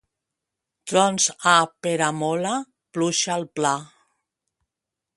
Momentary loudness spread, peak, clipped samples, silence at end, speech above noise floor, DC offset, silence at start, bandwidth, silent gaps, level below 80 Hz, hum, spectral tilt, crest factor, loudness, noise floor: 11 LU; -2 dBFS; under 0.1%; 1.3 s; 64 dB; under 0.1%; 0.85 s; 11.5 kHz; none; -72 dBFS; none; -3 dB/octave; 22 dB; -22 LUFS; -86 dBFS